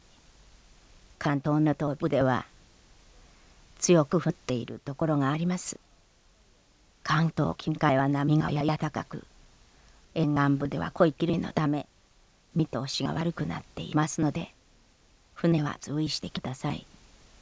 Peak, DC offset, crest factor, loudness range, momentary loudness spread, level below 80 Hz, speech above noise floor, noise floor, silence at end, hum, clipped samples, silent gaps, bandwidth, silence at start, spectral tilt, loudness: -8 dBFS; under 0.1%; 22 dB; 3 LU; 12 LU; -56 dBFS; 34 dB; -62 dBFS; 0.6 s; none; under 0.1%; none; 8 kHz; 1.2 s; -6 dB/octave; -28 LUFS